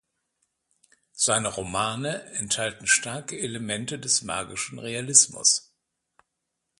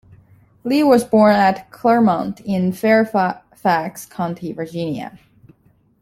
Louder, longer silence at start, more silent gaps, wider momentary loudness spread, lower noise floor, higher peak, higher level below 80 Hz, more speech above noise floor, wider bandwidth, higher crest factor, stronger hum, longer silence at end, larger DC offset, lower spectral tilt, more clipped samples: second, -24 LUFS vs -17 LUFS; first, 1.15 s vs 0.65 s; neither; about the same, 14 LU vs 14 LU; first, -81 dBFS vs -57 dBFS; about the same, -2 dBFS vs -2 dBFS; about the same, -60 dBFS vs -58 dBFS; first, 55 dB vs 40 dB; second, 11.5 kHz vs 15.5 kHz; first, 26 dB vs 16 dB; neither; first, 1.2 s vs 0.85 s; neither; second, -1 dB/octave vs -6.5 dB/octave; neither